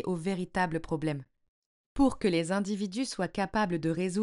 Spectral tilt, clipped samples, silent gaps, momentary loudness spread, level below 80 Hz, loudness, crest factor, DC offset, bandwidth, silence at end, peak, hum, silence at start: -6 dB/octave; under 0.1%; 1.48-1.95 s; 5 LU; -52 dBFS; -31 LUFS; 16 dB; under 0.1%; 11.5 kHz; 0 s; -14 dBFS; none; 0 s